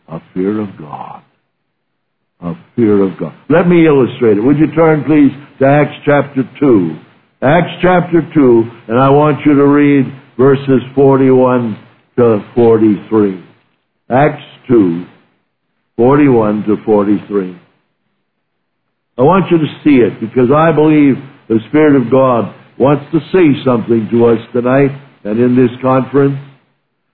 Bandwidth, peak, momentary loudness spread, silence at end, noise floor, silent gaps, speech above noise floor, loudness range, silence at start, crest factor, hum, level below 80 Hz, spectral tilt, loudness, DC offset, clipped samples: 4.3 kHz; 0 dBFS; 12 LU; 0.7 s; -69 dBFS; none; 59 dB; 4 LU; 0.1 s; 10 dB; none; -44 dBFS; -12 dB/octave; -11 LUFS; under 0.1%; under 0.1%